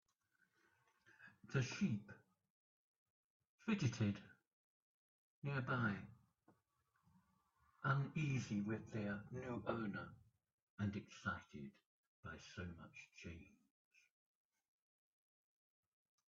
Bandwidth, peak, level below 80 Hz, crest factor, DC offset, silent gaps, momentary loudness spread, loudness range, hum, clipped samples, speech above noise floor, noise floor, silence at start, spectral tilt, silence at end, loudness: 7.4 kHz; -26 dBFS; -78 dBFS; 22 dB; under 0.1%; 2.50-3.40 s, 3.47-3.58 s, 4.47-5.42 s, 10.53-10.77 s, 11.86-12.23 s; 18 LU; 13 LU; none; under 0.1%; 40 dB; -85 dBFS; 1.2 s; -6 dB/octave; 2.8 s; -45 LUFS